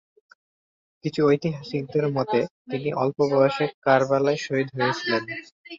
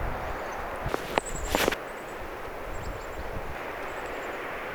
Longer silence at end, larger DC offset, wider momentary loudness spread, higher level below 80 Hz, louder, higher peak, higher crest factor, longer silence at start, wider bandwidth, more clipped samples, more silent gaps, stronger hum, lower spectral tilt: about the same, 0 s vs 0 s; neither; about the same, 10 LU vs 11 LU; second, -64 dBFS vs -42 dBFS; first, -24 LUFS vs -33 LUFS; about the same, -6 dBFS vs -4 dBFS; second, 20 dB vs 28 dB; first, 1.05 s vs 0 s; second, 7.6 kHz vs over 20 kHz; neither; first, 2.50-2.65 s, 3.74-3.82 s, 5.52-5.64 s vs none; neither; first, -6.5 dB/octave vs -3.5 dB/octave